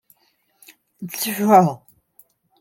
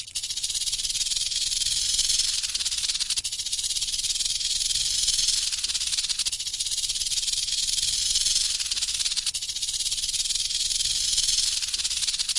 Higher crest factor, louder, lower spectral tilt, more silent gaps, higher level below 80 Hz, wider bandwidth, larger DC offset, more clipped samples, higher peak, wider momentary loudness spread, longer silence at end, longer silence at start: about the same, 20 dB vs 18 dB; first, -17 LUFS vs -23 LUFS; first, -5.5 dB/octave vs 3 dB/octave; neither; second, -70 dBFS vs -48 dBFS; first, 17 kHz vs 12 kHz; neither; neither; first, -2 dBFS vs -8 dBFS; first, 23 LU vs 5 LU; first, 0.85 s vs 0 s; first, 1 s vs 0 s